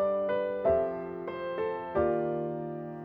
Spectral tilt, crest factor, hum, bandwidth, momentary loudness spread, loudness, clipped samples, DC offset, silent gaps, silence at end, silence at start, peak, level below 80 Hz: -10 dB/octave; 16 dB; none; 5 kHz; 9 LU; -31 LUFS; under 0.1%; under 0.1%; none; 0 s; 0 s; -14 dBFS; -56 dBFS